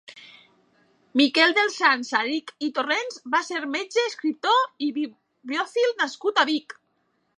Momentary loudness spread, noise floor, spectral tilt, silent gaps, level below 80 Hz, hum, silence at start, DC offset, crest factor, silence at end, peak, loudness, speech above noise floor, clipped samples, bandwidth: 10 LU; -71 dBFS; -1.5 dB/octave; none; -84 dBFS; none; 0.1 s; under 0.1%; 20 dB; 0.65 s; -6 dBFS; -23 LUFS; 47 dB; under 0.1%; 10.5 kHz